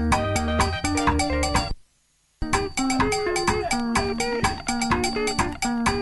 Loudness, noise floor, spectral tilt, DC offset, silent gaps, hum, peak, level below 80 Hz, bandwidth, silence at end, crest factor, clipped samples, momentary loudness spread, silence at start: -24 LUFS; -65 dBFS; -4 dB/octave; under 0.1%; none; none; -8 dBFS; -34 dBFS; 12 kHz; 0 s; 16 dB; under 0.1%; 4 LU; 0 s